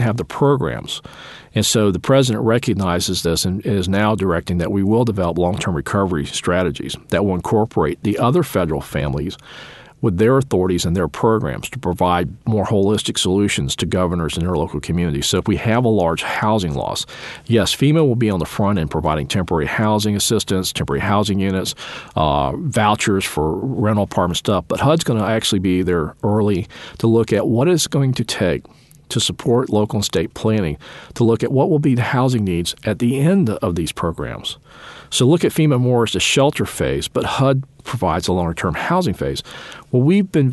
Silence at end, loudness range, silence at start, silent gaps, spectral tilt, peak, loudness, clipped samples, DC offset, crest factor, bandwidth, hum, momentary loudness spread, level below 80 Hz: 0 s; 2 LU; 0 s; none; -5.5 dB/octave; -2 dBFS; -18 LUFS; under 0.1%; under 0.1%; 16 dB; 12.5 kHz; none; 8 LU; -40 dBFS